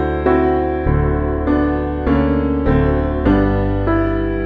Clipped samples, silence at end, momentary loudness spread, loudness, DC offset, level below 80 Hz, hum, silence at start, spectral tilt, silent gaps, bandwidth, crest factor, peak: under 0.1%; 0 s; 3 LU; -17 LUFS; under 0.1%; -24 dBFS; none; 0 s; -10.5 dB/octave; none; 4.9 kHz; 14 dB; -2 dBFS